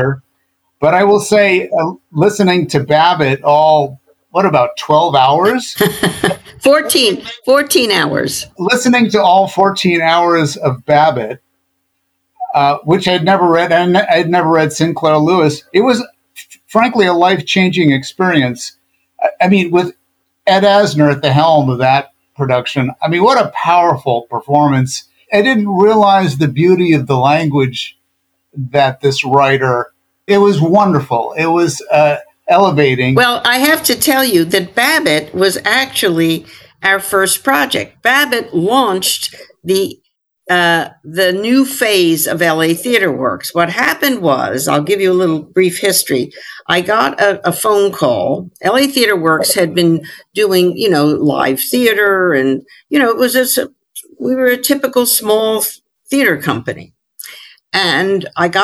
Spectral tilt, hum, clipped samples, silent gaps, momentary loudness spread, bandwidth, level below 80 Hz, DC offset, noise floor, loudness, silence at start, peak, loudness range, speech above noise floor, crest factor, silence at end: -4.5 dB/octave; none; under 0.1%; none; 8 LU; 18.5 kHz; -56 dBFS; under 0.1%; -66 dBFS; -12 LUFS; 0 s; 0 dBFS; 3 LU; 54 dB; 12 dB; 0 s